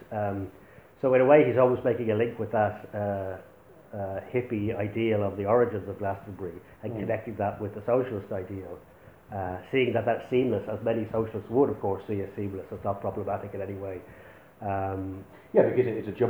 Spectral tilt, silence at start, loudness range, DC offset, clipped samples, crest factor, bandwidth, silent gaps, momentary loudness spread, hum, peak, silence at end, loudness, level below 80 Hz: -9 dB/octave; 0 s; 7 LU; under 0.1%; under 0.1%; 22 dB; over 20 kHz; none; 15 LU; none; -6 dBFS; 0 s; -28 LUFS; -60 dBFS